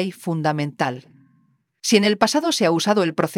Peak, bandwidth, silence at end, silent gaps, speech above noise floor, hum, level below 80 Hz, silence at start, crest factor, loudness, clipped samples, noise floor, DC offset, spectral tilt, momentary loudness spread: -2 dBFS; 17 kHz; 0 s; none; 43 dB; none; -66 dBFS; 0 s; 18 dB; -20 LUFS; under 0.1%; -62 dBFS; under 0.1%; -4.5 dB/octave; 8 LU